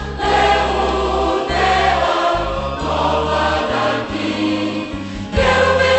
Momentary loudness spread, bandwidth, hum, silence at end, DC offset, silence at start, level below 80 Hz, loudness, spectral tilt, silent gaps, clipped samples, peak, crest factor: 8 LU; 8.4 kHz; none; 0 s; under 0.1%; 0 s; -30 dBFS; -17 LUFS; -5 dB/octave; none; under 0.1%; -2 dBFS; 14 dB